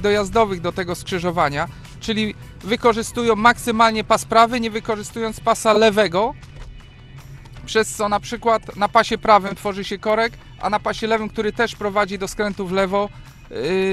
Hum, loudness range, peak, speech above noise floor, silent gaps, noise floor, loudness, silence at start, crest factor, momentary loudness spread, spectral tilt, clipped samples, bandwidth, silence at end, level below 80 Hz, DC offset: none; 4 LU; 0 dBFS; 21 dB; none; -40 dBFS; -19 LUFS; 0 s; 20 dB; 11 LU; -4 dB/octave; under 0.1%; 15 kHz; 0 s; -42 dBFS; under 0.1%